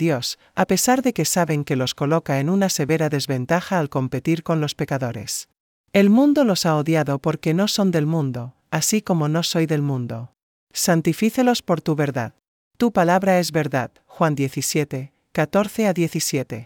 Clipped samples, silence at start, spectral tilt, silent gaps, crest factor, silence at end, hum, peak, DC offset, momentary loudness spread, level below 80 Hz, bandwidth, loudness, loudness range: under 0.1%; 0 s; -5 dB/octave; 5.60-5.84 s, 10.43-10.67 s, 12.48-12.71 s; 16 dB; 0 s; none; -4 dBFS; under 0.1%; 9 LU; -60 dBFS; 18.5 kHz; -20 LUFS; 3 LU